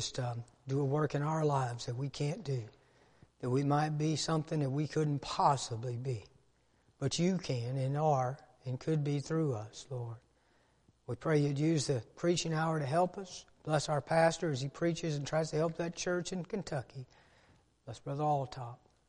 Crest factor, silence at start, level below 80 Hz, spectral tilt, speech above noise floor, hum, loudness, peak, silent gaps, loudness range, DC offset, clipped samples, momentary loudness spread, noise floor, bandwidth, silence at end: 20 dB; 0 s; -66 dBFS; -6 dB/octave; 37 dB; none; -34 LUFS; -14 dBFS; none; 4 LU; under 0.1%; under 0.1%; 13 LU; -71 dBFS; 11 kHz; 0.35 s